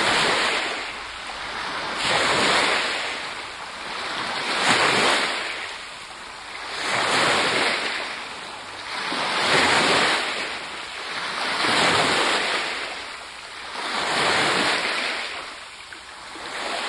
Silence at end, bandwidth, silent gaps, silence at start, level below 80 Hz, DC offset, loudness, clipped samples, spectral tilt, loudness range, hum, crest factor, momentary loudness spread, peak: 0 s; 12 kHz; none; 0 s; -58 dBFS; under 0.1%; -22 LUFS; under 0.1%; -1.5 dB/octave; 3 LU; none; 20 dB; 16 LU; -4 dBFS